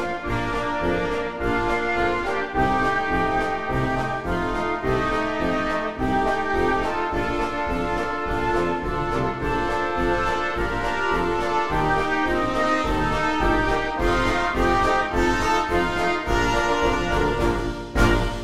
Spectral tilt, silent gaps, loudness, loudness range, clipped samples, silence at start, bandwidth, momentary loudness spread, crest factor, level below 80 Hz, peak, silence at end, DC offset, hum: -5.5 dB/octave; none; -23 LUFS; 3 LU; under 0.1%; 0 s; 15 kHz; 4 LU; 18 dB; -32 dBFS; -4 dBFS; 0 s; 2%; none